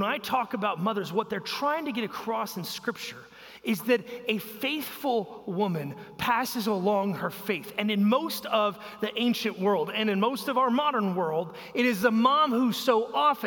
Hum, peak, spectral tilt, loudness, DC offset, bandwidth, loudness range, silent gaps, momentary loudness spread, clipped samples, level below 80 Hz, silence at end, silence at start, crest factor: none; -8 dBFS; -5 dB/octave; -27 LUFS; under 0.1%; 17 kHz; 5 LU; none; 9 LU; under 0.1%; -70 dBFS; 0 s; 0 s; 18 dB